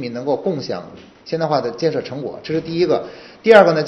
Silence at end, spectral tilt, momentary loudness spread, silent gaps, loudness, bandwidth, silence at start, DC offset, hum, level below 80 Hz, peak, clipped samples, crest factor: 0 s; -6.5 dB/octave; 17 LU; none; -18 LUFS; 8.4 kHz; 0 s; under 0.1%; none; -58 dBFS; 0 dBFS; 0.2%; 18 dB